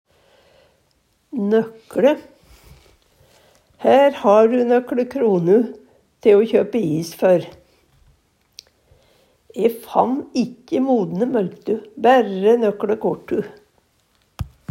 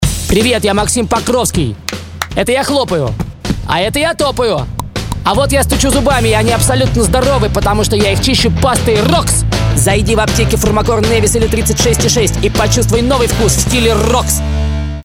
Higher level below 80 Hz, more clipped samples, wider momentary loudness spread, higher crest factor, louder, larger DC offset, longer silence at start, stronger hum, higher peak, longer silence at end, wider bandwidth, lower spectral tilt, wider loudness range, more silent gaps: second, -52 dBFS vs -20 dBFS; neither; first, 12 LU vs 6 LU; first, 18 dB vs 12 dB; second, -18 LUFS vs -12 LUFS; neither; first, 1.35 s vs 0 s; neither; about the same, 0 dBFS vs 0 dBFS; first, 0.25 s vs 0 s; about the same, 16 kHz vs 17.5 kHz; first, -7 dB/octave vs -4.5 dB/octave; first, 7 LU vs 4 LU; neither